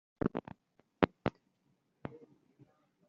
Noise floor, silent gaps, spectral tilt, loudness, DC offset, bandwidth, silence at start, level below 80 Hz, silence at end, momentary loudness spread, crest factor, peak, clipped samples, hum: -77 dBFS; none; -5.5 dB/octave; -37 LUFS; under 0.1%; 7 kHz; 0.25 s; -62 dBFS; 0.9 s; 23 LU; 34 dB; -6 dBFS; under 0.1%; none